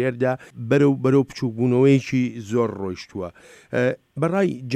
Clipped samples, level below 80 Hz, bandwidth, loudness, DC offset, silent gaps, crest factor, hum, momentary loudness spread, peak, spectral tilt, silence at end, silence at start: under 0.1%; -60 dBFS; 10 kHz; -21 LUFS; under 0.1%; none; 16 dB; none; 13 LU; -6 dBFS; -7.5 dB/octave; 0 s; 0 s